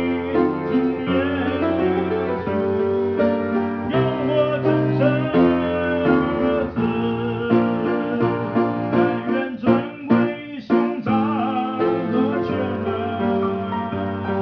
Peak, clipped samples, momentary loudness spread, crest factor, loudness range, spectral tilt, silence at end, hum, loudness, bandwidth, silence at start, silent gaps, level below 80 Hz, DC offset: -4 dBFS; under 0.1%; 5 LU; 16 dB; 2 LU; -9.5 dB/octave; 0 s; none; -21 LUFS; 5.4 kHz; 0 s; none; -50 dBFS; under 0.1%